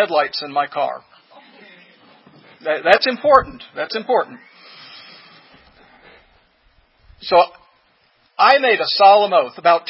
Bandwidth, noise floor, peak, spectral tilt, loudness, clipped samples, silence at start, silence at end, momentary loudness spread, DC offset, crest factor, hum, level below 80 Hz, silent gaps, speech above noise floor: 8 kHz; -59 dBFS; 0 dBFS; -5 dB/octave; -16 LUFS; under 0.1%; 0 s; 0.1 s; 22 LU; under 0.1%; 18 dB; none; -54 dBFS; none; 43 dB